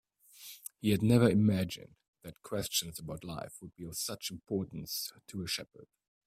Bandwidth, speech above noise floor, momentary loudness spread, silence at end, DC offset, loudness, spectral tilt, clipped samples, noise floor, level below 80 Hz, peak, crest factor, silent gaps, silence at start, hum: 16 kHz; 21 dB; 22 LU; 0.4 s; under 0.1%; -33 LUFS; -5 dB/octave; under 0.1%; -54 dBFS; -62 dBFS; -12 dBFS; 22 dB; 2.08-2.13 s; 0.4 s; none